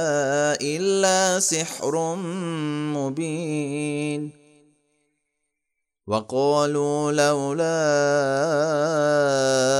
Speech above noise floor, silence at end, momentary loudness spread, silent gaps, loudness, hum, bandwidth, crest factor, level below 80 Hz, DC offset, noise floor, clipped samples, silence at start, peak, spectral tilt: 58 dB; 0 s; 8 LU; none; -22 LUFS; none; 16 kHz; 18 dB; -72 dBFS; under 0.1%; -80 dBFS; under 0.1%; 0 s; -6 dBFS; -4 dB/octave